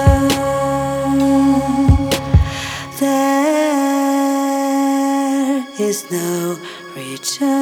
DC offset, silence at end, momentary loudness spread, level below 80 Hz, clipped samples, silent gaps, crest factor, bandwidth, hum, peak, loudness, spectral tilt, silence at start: under 0.1%; 0 s; 9 LU; -26 dBFS; under 0.1%; none; 16 dB; 19 kHz; none; 0 dBFS; -16 LUFS; -5.5 dB/octave; 0 s